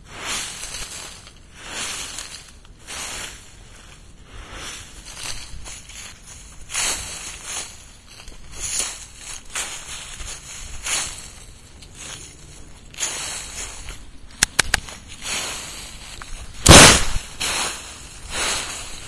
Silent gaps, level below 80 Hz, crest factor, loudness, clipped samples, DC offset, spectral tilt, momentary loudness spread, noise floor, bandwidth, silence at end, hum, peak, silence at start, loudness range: none; -36 dBFS; 24 dB; -19 LUFS; under 0.1%; 0.1%; -2 dB/octave; 19 LU; -43 dBFS; 12 kHz; 0 s; none; 0 dBFS; 0 s; 19 LU